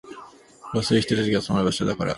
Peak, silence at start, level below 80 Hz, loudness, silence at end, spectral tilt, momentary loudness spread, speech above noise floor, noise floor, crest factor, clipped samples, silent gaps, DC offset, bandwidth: -6 dBFS; 0.05 s; -50 dBFS; -23 LUFS; 0 s; -5.5 dB/octave; 15 LU; 24 dB; -46 dBFS; 18 dB; under 0.1%; none; under 0.1%; 11.5 kHz